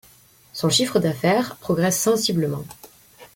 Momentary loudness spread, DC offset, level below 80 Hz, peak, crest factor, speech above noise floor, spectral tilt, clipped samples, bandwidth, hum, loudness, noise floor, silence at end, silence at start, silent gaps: 12 LU; under 0.1%; -58 dBFS; -6 dBFS; 18 dB; 32 dB; -4 dB/octave; under 0.1%; 17 kHz; none; -21 LUFS; -53 dBFS; 0.1 s; 0.55 s; none